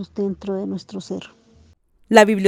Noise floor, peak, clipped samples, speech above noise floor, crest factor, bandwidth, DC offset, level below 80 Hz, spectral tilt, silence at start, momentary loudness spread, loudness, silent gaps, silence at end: -55 dBFS; 0 dBFS; under 0.1%; 36 dB; 20 dB; 16.5 kHz; under 0.1%; -56 dBFS; -5 dB/octave; 0 s; 18 LU; -20 LUFS; none; 0 s